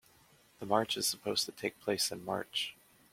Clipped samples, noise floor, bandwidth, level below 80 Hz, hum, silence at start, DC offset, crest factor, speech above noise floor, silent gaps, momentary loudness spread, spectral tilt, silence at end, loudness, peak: under 0.1%; -65 dBFS; 16.5 kHz; -74 dBFS; none; 0.6 s; under 0.1%; 24 dB; 30 dB; none; 7 LU; -2 dB/octave; 0.4 s; -34 LUFS; -14 dBFS